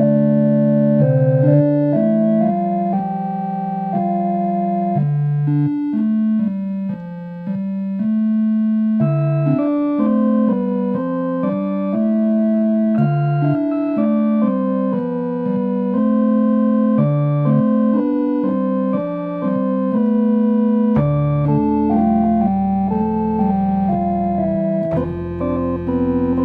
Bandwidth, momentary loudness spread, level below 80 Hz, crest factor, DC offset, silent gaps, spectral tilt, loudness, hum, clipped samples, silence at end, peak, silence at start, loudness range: 3.9 kHz; 7 LU; -44 dBFS; 14 dB; under 0.1%; none; -12.5 dB/octave; -17 LUFS; none; under 0.1%; 0 s; -2 dBFS; 0 s; 3 LU